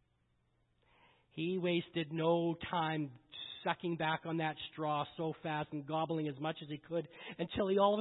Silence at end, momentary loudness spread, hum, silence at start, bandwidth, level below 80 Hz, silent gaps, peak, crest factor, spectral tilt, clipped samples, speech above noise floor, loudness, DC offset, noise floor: 0 s; 9 LU; none; 1.35 s; 4 kHz; -70 dBFS; none; -16 dBFS; 20 dB; -4.5 dB/octave; under 0.1%; 40 dB; -37 LUFS; under 0.1%; -77 dBFS